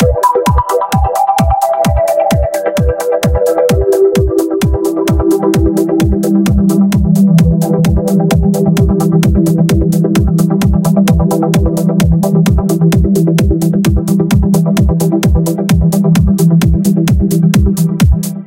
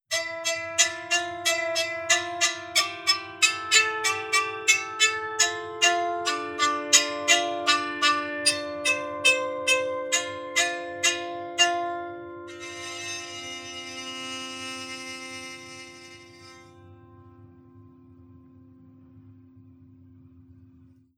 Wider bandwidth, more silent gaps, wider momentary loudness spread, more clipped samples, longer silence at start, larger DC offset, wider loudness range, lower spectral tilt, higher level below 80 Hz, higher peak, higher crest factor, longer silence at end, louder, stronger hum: about the same, 17 kHz vs 18 kHz; neither; second, 3 LU vs 15 LU; neither; about the same, 0 s vs 0.1 s; neither; second, 2 LU vs 14 LU; first, -7 dB/octave vs 0 dB/octave; first, -18 dBFS vs -74 dBFS; about the same, 0 dBFS vs -2 dBFS; second, 10 dB vs 26 dB; second, 0 s vs 0.75 s; first, -11 LUFS vs -24 LUFS; neither